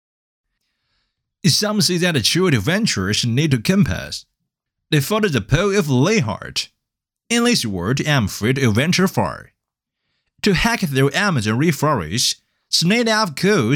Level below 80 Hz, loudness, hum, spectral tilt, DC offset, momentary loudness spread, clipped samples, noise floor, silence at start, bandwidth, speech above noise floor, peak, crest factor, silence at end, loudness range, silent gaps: -42 dBFS; -18 LUFS; none; -4.5 dB/octave; under 0.1%; 7 LU; under 0.1%; -82 dBFS; 1.45 s; 19 kHz; 64 dB; -2 dBFS; 16 dB; 0 s; 2 LU; none